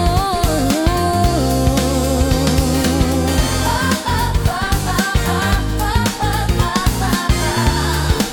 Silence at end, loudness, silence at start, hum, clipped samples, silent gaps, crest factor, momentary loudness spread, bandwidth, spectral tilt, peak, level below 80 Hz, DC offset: 0 s; -17 LUFS; 0 s; none; under 0.1%; none; 12 dB; 2 LU; 18 kHz; -5 dB/octave; -2 dBFS; -22 dBFS; under 0.1%